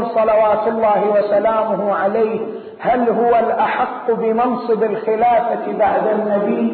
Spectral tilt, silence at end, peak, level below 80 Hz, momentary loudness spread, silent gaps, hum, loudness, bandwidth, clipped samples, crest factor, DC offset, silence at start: -11.5 dB/octave; 0 s; -6 dBFS; -54 dBFS; 5 LU; none; none; -16 LUFS; 4.5 kHz; under 0.1%; 10 dB; under 0.1%; 0 s